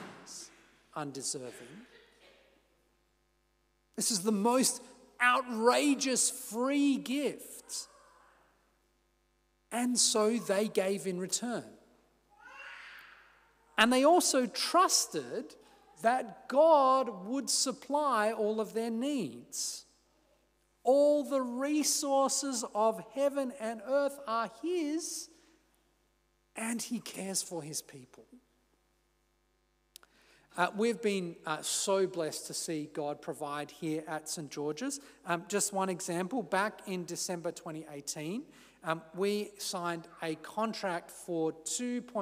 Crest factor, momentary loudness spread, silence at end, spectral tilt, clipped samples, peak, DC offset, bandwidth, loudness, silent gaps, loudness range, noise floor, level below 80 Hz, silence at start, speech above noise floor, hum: 22 dB; 15 LU; 0 s; -2.5 dB/octave; under 0.1%; -12 dBFS; under 0.1%; 16 kHz; -32 LUFS; none; 10 LU; -74 dBFS; -78 dBFS; 0 s; 42 dB; 50 Hz at -75 dBFS